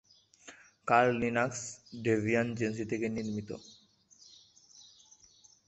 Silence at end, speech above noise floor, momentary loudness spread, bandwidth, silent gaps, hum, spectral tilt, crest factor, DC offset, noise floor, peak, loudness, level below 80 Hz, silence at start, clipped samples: 0.85 s; 31 dB; 19 LU; 8.4 kHz; none; none; -5.5 dB/octave; 24 dB; under 0.1%; -63 dBFS; -10 dBFS; -32 LUFS; -66 dBFS; 0.45 s; under 0.1%